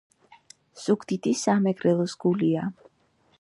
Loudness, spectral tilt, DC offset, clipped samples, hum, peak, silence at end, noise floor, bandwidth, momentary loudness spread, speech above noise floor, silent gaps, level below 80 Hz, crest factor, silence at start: -25 LUFS; -6 dB/octave; under 0.1%; under 0.1%; none; -10 dBFS; 0.7 s; -65 dBFS; 11.5 kHz; 6 LU; 41 dB; none; -70 dBFS; 18 dB; 0.75 s